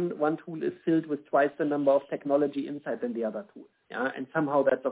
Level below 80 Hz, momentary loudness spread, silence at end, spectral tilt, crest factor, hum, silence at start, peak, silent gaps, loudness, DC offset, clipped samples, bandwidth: -78 dBFS; 9 LU; 0 s; -10.5 dB/octave; 16 dB; none; 0 s; -12 dBFS; none; -28 LUFS; under 0.1%; under 0.1%; 4 kHz